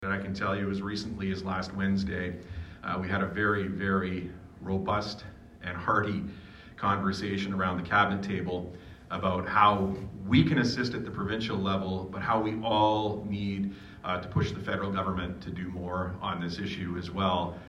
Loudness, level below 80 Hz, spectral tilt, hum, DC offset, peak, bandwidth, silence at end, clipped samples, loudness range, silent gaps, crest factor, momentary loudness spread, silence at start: -30 LUFS; -52 dBFS; -6.5 dB/octave; none; under 0.1%; -8 dBFS; 10 kHz; 0 s; under 0.1%; 5 LU; none; 22 dB; 12 LU; 0 s